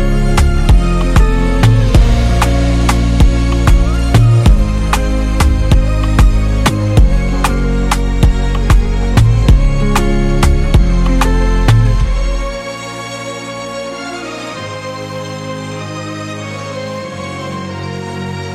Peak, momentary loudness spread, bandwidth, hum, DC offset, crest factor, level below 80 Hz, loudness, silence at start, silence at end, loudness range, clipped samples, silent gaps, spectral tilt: 0 dBFS; 12 LU; 13.5 kHz; none; under 0.1%; 10 dB; -12 dBFS; -14 LUFS; 0 s; 0 s; 11 LU; under 0.1%; none; -6 dB/octave